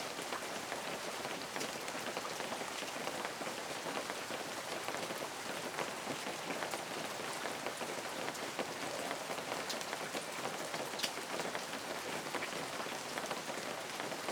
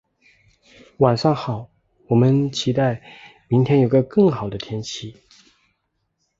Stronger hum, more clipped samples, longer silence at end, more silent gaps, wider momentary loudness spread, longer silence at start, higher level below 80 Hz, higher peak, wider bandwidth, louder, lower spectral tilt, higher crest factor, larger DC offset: neither; neither; second, 0 s vs 1.3 s; neither; second, 2 LU vs 14 LU; second, 0 s vs 1 s; second, -78 dBFS vs -54 dBFS; second, -20 dBFS vs -2 dBFS; first, over 20 kHz vs 7.8 kHz; second, -40 LUFS vs -19 LUFS; second, -2 dB/octave vs -7 dB/octave; about the same, 22 dB vs 20 dB; neither